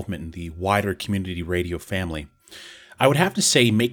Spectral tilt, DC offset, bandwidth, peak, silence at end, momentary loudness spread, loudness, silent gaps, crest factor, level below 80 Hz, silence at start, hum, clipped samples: -4 dB/octave; under 0.1%; 20 kHz; 0 dBFS; 0 s; 23 LU; -22 LUFS; none; 22 dB; -46 dBFS; 0 s; none; under 0.1%